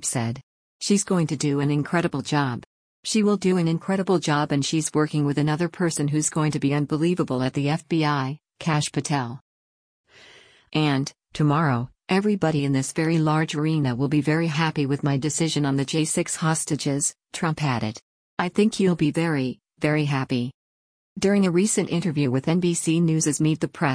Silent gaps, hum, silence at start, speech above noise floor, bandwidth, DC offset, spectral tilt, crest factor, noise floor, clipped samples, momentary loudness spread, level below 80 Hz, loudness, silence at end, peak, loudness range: 0.43-0.80 s, 2.66-3.03 s, 9.41-10.04 s, 18.02-18.37 s, 20.54-21.16 s; none; 0 s; 29 dB; 10.5 kHz; under 0.1%; -5 dB/octave; 16 dB; -52 dBFS; under 0.1%; 7 LU; -60 dBFS; -23 LUFS; 0 s; -8 dBFS; 3 LU